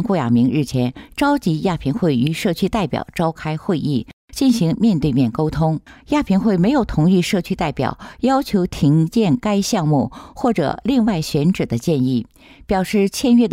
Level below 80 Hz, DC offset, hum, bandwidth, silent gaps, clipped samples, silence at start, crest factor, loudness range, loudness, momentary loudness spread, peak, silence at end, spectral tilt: -40 dBFS; under 0.1%; none; 16 kHz; 4.13-4.28 s; under 0.1%; 0 s; 12 dB; 2 LU; -18 LUFS; 7 LU; -6 dBFS; 0 s; -6.5 dB/octave